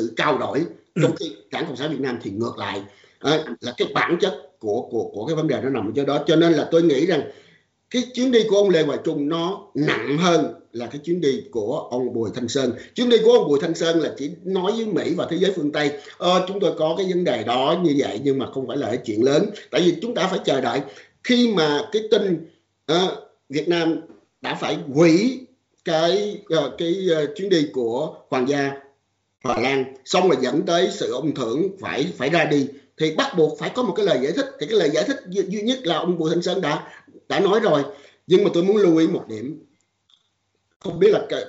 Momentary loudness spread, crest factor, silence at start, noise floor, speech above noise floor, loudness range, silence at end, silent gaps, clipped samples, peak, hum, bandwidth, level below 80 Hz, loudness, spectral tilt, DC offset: 10 LU; 18 dB; 0 s; -70 dBFS; 50 dB; 3 LU; 0 s; 40.76-40.80 s; under 0.1%; -4 dBFS; none; 8 kHz; -66 dBFS; -21 LUFS; -4 dB/octave; under 0.1%